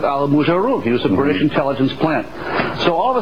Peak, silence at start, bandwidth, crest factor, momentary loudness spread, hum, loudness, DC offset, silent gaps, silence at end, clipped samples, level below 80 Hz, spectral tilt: -2 dBFS; 0 s; 6.8 kHz; 14 dB; 5 LU; none; -17 LUFS; 2%; none; 0 s; under 0.1%; -46 dBFS; -7.5 dB/octave